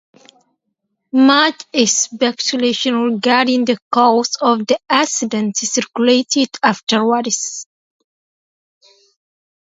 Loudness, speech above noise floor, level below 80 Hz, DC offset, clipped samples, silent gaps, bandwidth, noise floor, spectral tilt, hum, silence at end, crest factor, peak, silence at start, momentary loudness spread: -15 LUFS; 57 dB; -68 dBFS; under 0.1%; under 0.1%; 3.82-3.91 s; 8 kHz; -73 dBFS; -2.5 dB/octave; none; 2.05 s; 16 dB; 0 dBFS; 1.15 s; 5 LU